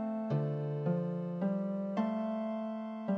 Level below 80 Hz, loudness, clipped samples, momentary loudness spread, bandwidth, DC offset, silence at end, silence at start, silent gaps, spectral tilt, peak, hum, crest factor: -82 dBFS; -35 LUFS; under 0.1%; 4 LU; 5.6 kHz; under 0.1%; 0 s; 0 s; none; -10.5 dB/octave; -22 dBFS; none; 12 dB